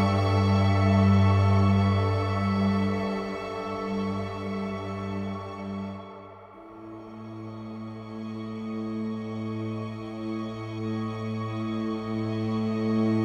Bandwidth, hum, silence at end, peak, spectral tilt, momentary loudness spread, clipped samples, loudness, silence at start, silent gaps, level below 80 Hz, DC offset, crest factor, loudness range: 7.8 kHz; none; 0 s; -10 dBFS; -8 dB/octave; 18 LU; under 0.1%; -27 LUFS; 0 s; none; -56 dBFS; under 0.1%; 16 dB; 14 LU